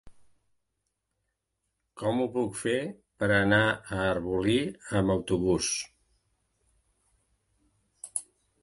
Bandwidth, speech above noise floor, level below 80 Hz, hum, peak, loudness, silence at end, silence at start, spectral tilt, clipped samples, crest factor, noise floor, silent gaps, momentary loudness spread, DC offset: 11.5 kHz; 54 dB; -54 dBFS; none; -10 dBFS; -28 LUFS; 0.4 s; 0.05 s; -4.5 dB/octave; under 0.1%; 22 dB; -82 dBFS; none; 12 LU; under 0.1%